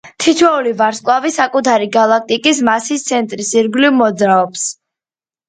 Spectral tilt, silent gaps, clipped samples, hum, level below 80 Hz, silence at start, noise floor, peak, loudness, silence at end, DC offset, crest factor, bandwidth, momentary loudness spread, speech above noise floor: -3 dB/octave; none; under 0.1%; none; -60 dBFS; 0.05 s; under -90 dBFS; 0 dBFS; -13 LUFS; 0.75 s; under 0.1%; 14 dB; 9.6 kHz; 5 LU; over 77 dB